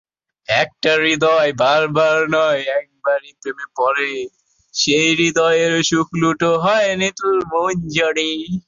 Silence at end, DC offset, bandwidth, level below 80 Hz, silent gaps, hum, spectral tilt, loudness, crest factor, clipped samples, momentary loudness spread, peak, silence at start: 0.05 s; under 0.1%; 7.6 kHz; -54 dBFS; none; none; -3.5 dB/octave; -16 LUFS; 16 dB; under 0.1%; 8 LU; -2 dBFS; 0.5 s